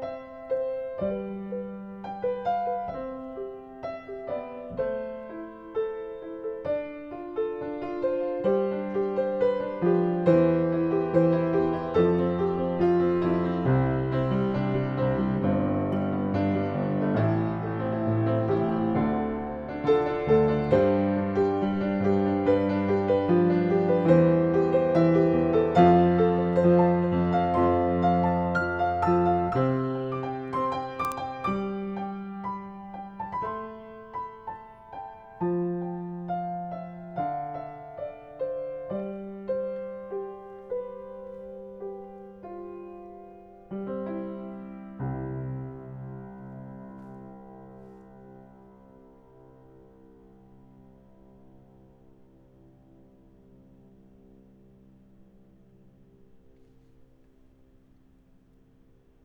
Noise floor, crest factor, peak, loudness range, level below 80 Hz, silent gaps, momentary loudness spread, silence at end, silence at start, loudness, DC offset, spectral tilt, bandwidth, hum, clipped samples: -59 dBFS; 22 dB; -6 dBFS; 16 LU; -54 dBFS; none; 18 LU; 2.9 s; 0 s; -26 LUFS; under 0.1%; -9.5 dB/octave; 7.2 kHz; none; under 0.1%